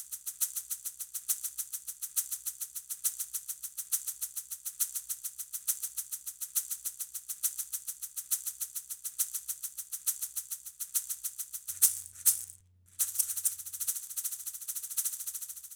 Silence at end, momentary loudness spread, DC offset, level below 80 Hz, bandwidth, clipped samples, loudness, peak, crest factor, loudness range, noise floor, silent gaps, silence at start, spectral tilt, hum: 0 s; 10 LU; under 0.1%; -78 dBFS; over 20 kHz; under 0.1%; -33 LUFS; -6 dBFS; 32 dB; 5 LU; -56 dBFS; none; 0 s; 3.5 dB/octave; none